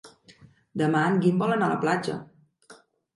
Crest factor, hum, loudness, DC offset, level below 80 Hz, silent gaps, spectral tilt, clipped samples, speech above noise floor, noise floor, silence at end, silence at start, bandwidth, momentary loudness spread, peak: 16 dB; none; -24 LUFS; under 0.1%; -70 dBFS; none; -7 dB/octave; under 0.1%; 31 dB; -55 dBFS; 0.45 s; 0.05 s; 11.5 kHz; 13 LU; -10 dBFS